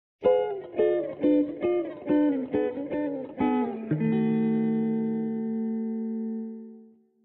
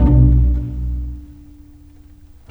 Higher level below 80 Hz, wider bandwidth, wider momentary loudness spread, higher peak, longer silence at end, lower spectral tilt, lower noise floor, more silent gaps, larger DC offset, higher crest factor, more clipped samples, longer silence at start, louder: second, -66 dBFS vs -18 dBFS; first, 4 kHz vs 2.1 kHz; second, 8 LU vs 19 LU; second, -10 dBFS vs -2 dBFS; second, 0.4 s vs 1.2 s; second, -8 dB/octave vs -11.5 dB/octave; first, -53 dBFS vs -42 dBFS; neither; neither; about the same, 16 dB vs 16 dB; neither; first, 0.2 s vs 0 s; second, -27 LUFS vs -17 LUFS